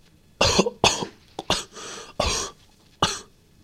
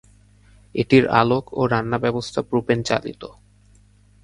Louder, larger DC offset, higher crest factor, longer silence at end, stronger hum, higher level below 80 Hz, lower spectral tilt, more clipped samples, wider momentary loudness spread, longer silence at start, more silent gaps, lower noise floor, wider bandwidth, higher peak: second, -23 LUFS vs -20 LUFS; neither; about the same, 26 dB vs 22 dB; second, 0.4 s vs 0.95 s; neither; first, -42 dBFS vs -50 dBFS; second, -2.5 dB/octave vs -6.5 dB/octave; neither; about the same, 16 LU vs 16 LU; second, 0.4 s vs 0.75 s; neither; about the same, -55 dBFS vs -53 dBFS; first, 16 kHz vs 11 kHz; about the same, -2 dBFS vs 0 dBFS